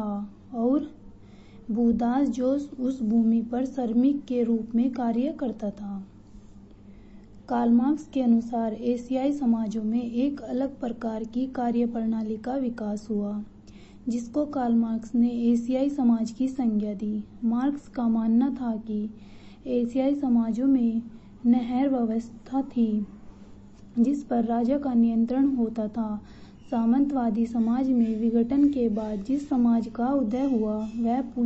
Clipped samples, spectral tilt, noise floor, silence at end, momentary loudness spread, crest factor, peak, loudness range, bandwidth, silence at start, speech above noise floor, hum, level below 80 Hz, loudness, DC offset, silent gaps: under 0.1%; -8 dB/octave; -48 dBFS; 0 s; 9 LU; 14 dB; -12 dBFS; 4 LU; 8 kHz; 0 s; 23 dB; none; -54 dBFS; -26 LUFS; under 0.1%; none